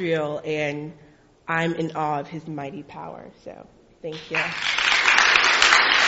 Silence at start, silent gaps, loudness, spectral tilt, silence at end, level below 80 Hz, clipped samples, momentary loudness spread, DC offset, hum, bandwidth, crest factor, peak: 0 s; none; -19 LUFS; -0.5 dB/octave; 0 s; -56 dBFS; under 0.1%; 23 LU; under 0.1%; none; 8 kHz; 22 dB; 0 dBFS